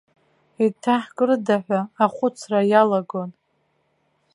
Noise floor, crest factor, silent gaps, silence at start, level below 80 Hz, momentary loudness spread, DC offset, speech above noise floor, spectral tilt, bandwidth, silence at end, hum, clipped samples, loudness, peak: -68 dBFS; 20 dB; none; 0.6 s; -76 dBFS; 9 LU; under 0.1%; 48 dB; -6.5 dB/octave; 11.5 kHz; 1.05 s; none; under 0.1%; -21 LUFS; -2 dBFS